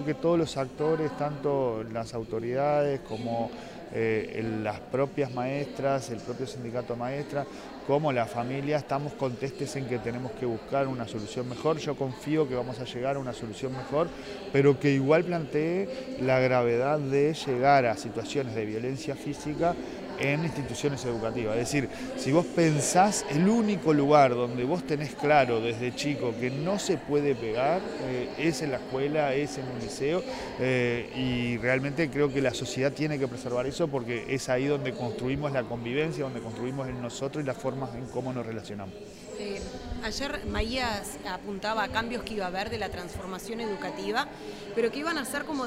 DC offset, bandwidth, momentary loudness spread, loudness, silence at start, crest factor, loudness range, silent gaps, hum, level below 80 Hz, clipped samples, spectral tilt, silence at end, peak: under 0.1%; 16 kHz; 11 LU; -29 LUFS; 0 s; 20 dB; 7 LU; none; none; -52 dBFS; under 0.1%; -5.5 dB/octave; 0 s; -8 dBFS